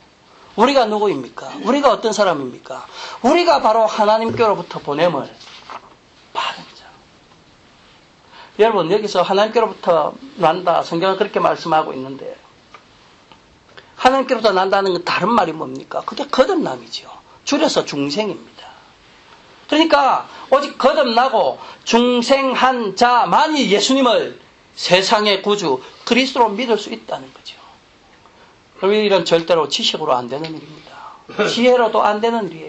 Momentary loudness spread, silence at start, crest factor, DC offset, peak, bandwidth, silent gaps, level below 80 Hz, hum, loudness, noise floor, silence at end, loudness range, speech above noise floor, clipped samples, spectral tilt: 16 LU; 0.55 s; 18 dB; under 0.1%; 0 dBFS; 8.6 kHz; none; -56 dBFS; none; -16 LUFS; -49 dBFS; 0 s; 6 LU; 33 dB; under 0.1%; -4 dB/octave